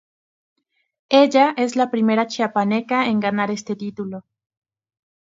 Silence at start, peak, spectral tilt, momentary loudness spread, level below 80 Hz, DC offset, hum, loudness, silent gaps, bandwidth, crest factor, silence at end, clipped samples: 1.1 s; 0 dBFS; -5 dB/octave; 14 LU; -70 dBFS; under 0.1%; none; -19 LUFS; none; 7.8 kHz; 20 dB; 1.05 s; under 0.1%